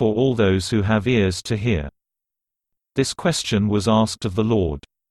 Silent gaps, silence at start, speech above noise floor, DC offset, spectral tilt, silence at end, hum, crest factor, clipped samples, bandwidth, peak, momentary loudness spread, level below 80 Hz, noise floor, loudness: none; 0 s; 66 dB; under 0.1%; -5.5 dB/octave; 0.3 s; none; 16 dB; under 0.1%; 12.5 kHz; -4 dBFS; 8 LU; -40 dBFS; -86 dBFS; -20 LUFS